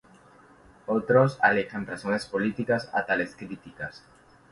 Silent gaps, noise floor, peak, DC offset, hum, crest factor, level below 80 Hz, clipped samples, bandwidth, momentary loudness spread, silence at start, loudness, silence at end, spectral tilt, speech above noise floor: none; -55 dBFS; -8 dBFS; under 0.1%; none; 20 dB; -62 dBFS; under 0.1%; 11.5 kHz; 17 LU; 0.9 s; -26 LUFS; 0.55 s; -6.5 dB/octave; 28 dB